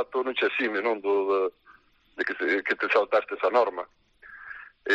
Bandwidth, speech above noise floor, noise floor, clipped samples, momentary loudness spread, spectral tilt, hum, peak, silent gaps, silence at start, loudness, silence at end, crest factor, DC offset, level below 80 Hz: 7.6 kHz; 32 dB; -58 dBFS; under 0.1%; 18 LU; -4 dB/octave; none; -10 dBFS; none; 0 s; -26 LUFS; 0 s; 18 dB; under 0.1%; -70 dBFS